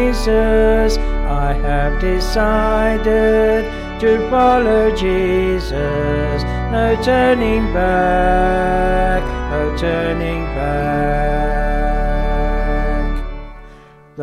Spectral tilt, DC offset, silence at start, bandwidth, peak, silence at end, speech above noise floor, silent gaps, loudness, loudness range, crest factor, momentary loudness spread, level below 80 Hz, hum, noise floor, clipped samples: -6.5 dB/octave; under 0.1%; 0 s; 12 kHz; -2 dBFS; 0 s; 27 dB; none; -16 LUFS; 4 LU; 12 dB; 7 LU; -20 dBFS; none; -41 dBFS; under 0.1%